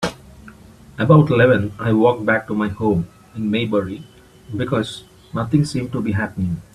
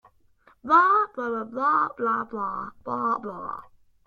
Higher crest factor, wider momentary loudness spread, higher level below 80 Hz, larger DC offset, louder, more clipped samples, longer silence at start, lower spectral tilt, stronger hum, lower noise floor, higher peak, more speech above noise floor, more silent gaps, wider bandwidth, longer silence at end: about the same, 18 dB vs 20 dB; about the same, 16 LU vs 17 LU; first, -48 dBFS vs -66 dBFS; neither; first, -19 LUFS vs -24 LUFS; neither; second, 0 s vs 0.65 s; about the same, -7.5 dB/octave vs -6.5 dB/octave; neither; second, -43 dBFS vs -60 dBFS; first, 0 dBFS vs -6 dBFS; second, 25 dB vs 35 dB; neither; first, 12.5 kHz vs 7 kHz; second, 0.15 s vs 0.45 s